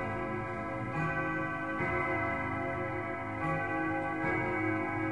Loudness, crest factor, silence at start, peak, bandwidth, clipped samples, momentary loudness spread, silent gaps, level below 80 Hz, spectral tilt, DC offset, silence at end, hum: -33 LUFS; 14 dB; 0 s; -20 dBFS; 11 kHz; under 0.1%; 5 LU; none; -56 dBFS; -8 dB/octave; 0.2%; 0 s; none